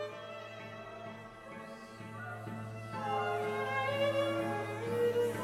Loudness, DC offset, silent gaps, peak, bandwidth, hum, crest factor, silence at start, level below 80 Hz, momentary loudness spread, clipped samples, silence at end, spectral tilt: -36 LUFS; under 0.1%; none; -22 dBFS; 16 kHz; none; 14 dB; 0 s; -70 dBFS; 15 LU; under 0.1%; 0 s; -5.5 dB/octave